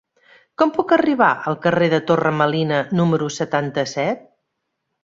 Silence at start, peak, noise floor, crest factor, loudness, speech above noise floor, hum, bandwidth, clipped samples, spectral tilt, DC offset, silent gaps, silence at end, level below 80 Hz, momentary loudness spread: 0.6 s; -2 dBFS; -76 dBFS; 18 dB; -19 LUFS; 58 dB; none; 7.8 kHz; under 0.1%; -6 dB/octave; under 0.1%; none; 0.85 s; -60 dBFS; 7 LU